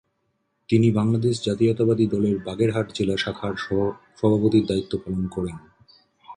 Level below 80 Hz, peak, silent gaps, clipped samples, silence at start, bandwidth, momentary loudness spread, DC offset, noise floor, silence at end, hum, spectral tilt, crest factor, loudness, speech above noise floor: -50 dBFS; -6 dBFS; none; under 0.1%; 0.7 s; 10.5 kHz; 9 LU; under 0.1%; -72 dBFS; 0 s; none; -7 dB/octave; 18 dB; -23 LUFS; 51 dB